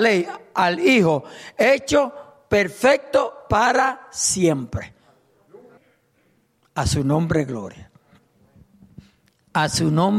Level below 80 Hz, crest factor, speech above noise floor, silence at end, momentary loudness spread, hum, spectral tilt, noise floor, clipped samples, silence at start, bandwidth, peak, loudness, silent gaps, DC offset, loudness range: -44 dBFS; 16 dB; 44 dB; 0 s; 13 LU; none; -4.5 dB/octave; -63 dBFS; under 0.1%; 0 s; 15 kHz; -6 dBFS; -20 LUFS; none; under 0.1%; 7 LU